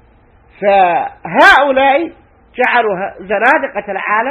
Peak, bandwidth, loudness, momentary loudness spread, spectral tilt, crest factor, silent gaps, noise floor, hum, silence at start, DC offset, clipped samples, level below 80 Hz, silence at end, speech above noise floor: 0 dBFS; 16 kHz; -12 LUFS; 13 LU; -4.5 dB/octave; 12 dB; none; -47 dBFS; none; 0.6 s; under 0.1%; 0.5%; -48 dBFS; 0 s; 35 dB